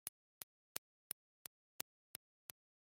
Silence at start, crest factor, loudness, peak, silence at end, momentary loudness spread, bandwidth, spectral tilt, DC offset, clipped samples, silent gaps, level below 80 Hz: 0.05 s; 42 dB; -53 LUFS; -14 dBFS; 2.05 s; 8 LU; 16 kHz; 0 dB/octave; under 0.1%; under 0.1%; 0.09-0.75 s; under -90 dBFS